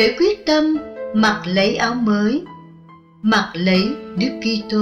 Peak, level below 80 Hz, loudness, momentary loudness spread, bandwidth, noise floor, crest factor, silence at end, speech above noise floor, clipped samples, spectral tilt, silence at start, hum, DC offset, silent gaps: -4 dBFS; -50 dBFS; -18 LUFS; 7 LU; 8.4 kHz; -45 dBFS; 14 dB; 0 s; 27 dB; under 0.1%; -5.5 dB/octave; 0 s; none; under 0.1%; none